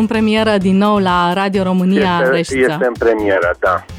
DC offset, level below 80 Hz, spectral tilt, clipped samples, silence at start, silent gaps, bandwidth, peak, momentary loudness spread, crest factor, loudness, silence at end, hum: under 0.1%; -40 dBFS; -6.5 dB/octave; under 0.1%; 0 s; none; 14.5 kHz; -4 dBFS; 2 LU; 10 dB; -14 LUFS; 0 s; none